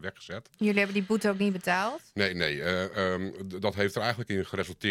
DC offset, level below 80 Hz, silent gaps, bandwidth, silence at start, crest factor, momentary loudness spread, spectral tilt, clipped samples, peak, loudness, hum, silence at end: under 0.1%; -66 dBFS; none; 16 kHz; 0 s; 22 dB; 8 LU; -5.5 dB/octave; under 0.1%; -8 dBFS; -29 LUFS; none; 0 s